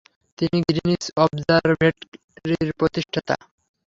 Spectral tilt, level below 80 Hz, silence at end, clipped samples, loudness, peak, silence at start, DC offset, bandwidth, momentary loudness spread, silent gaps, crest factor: -6 dB/octave; -52 dBFS; 0.5 s; under 0.1%; -22 LUFS; -2 dBFS; 0.4 s; under 0.1%; 7.8 kHz; 9 LU; 2.08-2.12 s, 2.24-2.28 s; 20 dB